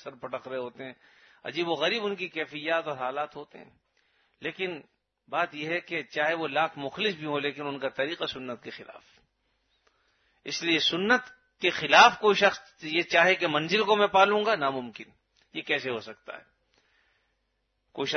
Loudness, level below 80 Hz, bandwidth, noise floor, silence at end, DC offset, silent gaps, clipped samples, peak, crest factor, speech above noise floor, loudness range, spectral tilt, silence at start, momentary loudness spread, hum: -26 LUFS; -72 dBFS; 6.6 kHz; -77 dBFS; 0 s; under 0.1%; none; under 0.1%; -4 dBFS; 24 dB; 49 dB; 12 LU; -3.5 dB/octave; 0.05 s; 21 LU; none